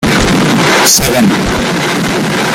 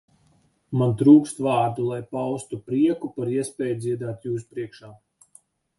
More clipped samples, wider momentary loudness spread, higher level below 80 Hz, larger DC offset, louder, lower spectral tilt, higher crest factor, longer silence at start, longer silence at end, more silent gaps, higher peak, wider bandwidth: neither; second, 6 LU vs 15 LU; first, -28 dBFS vs -62 dBFS; neither; first, -9 LUFS vs -23 LUFS; second, -3.5 dB/octave vs -7.5 dB/octave; second, 10 dB vs 20 dB; second, 0 s vs 0.7 s; second, 0 s vs 0.85 s; neither; first, 0 dBFS vs -4 dBFS; first, over 20 kHz vs 11.5 kHz